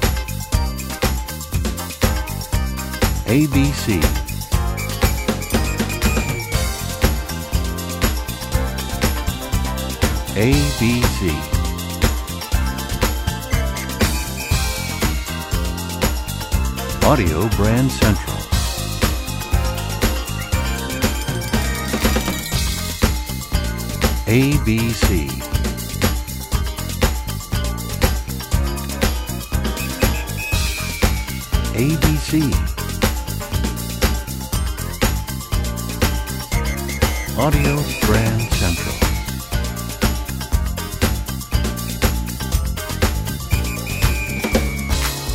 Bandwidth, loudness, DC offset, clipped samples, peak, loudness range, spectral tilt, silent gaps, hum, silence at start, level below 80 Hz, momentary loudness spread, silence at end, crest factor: 16.5 kHz; -20 LUFS; under 0.1%; under 0.1%; 0 dBFS; 3 LU; -4.5 dB/octave; none; none; 0 s; -24 dBFS; 7 LU; 0 s; 20 dB